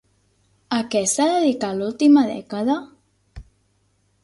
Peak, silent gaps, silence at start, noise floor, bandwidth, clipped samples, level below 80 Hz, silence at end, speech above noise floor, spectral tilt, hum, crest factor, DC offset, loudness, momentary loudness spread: -6 dBFS; none; 0.7 s; -65 dBFS; 11.5 kHz; under 0.1%; -54 dBFS; 0.8 s; 46 dB; -4 dB/octave; 50 Hz at -50 dBFS; 16 dB; under 0.1%; -20 LUFS; 10 LU